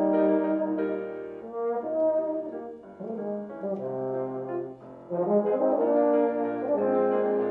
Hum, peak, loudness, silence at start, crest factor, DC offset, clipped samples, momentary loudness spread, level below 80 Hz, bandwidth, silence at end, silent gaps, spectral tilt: none; -12 dBFS; -27 LUFS; 0 s; 14 dB; under 0.1%; under 0.1%; 14 LU; -72 dBFS; 4.1 kHz; 0 s; none; -10.5 dB/octave